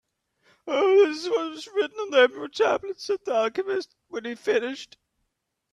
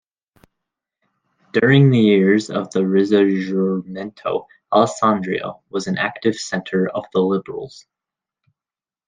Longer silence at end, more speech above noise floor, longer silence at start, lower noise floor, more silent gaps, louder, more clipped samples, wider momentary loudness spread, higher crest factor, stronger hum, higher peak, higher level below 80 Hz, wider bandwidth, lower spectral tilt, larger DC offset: second, 0.9 s vs 1.3 s; second, 55 dB vs over 72 dB; second, 0.65 s vs 1.55 s; second, -79 dBFS vs under -90 dBFS; neither; second, -24 LUFS vs -18 LUFS; neither; about the same, 15 LU vs 14 LU; about the same, 18 dB vs 18 dB; neither; second, -8 dBFS vs -2 dBFS; second, -74 dBFS vs -62 dBFS; first, 11 kHz vs 9.6 kHz; second, -3 dB/octave vs -6.5 dB/octave; neither